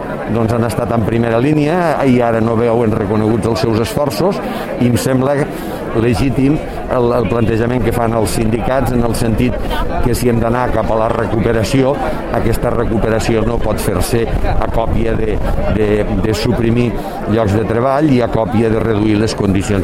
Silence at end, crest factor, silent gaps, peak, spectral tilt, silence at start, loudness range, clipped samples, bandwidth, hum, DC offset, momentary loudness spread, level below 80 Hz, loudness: 0 s; 14 dB; none; 0 dBFS; -6.5 dB/octave; 0 s; 2 LU; under 0.1%; 16.5 kHz; none; under 0.1%; 4 LU; -24 dBFS; -15 LUFS